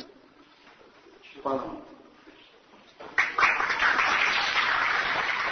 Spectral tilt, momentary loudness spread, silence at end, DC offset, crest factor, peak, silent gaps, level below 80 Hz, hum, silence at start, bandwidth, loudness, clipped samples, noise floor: -1.5 dB/octave; 11 LU; 0 s; under 0.1%; 20 dB; -8 dBFS; none; -60 dBFS; none; 0 s; 6.6 kHz; -24 LUFS; under 0.1%; -56 dBFS